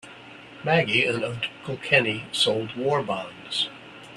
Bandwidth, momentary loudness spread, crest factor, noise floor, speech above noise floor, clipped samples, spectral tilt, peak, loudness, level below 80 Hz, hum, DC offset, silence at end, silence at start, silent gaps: 13 kHz; 16 LU; 24 dB; -45 dBFS; 20 dB; under 0.1%; -4 dB/octave; -2 dBFS; -24 LUFS; -64 dBFS; none; under 0.1%; 0 s; 0.05 s; none